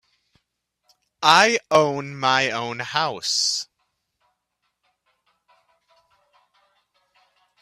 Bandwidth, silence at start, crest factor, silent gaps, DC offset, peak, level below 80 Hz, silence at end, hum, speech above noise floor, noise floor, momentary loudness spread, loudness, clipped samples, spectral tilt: 14.5 kHz; 1.2 s; 26 dB; none; under 0.1%; 0 dBFS; -70 dBFS; 4 s; none; 56 dB; -76 dBFS; 11 LU; -20 LUFS; under 0.1%; -2 dB/octave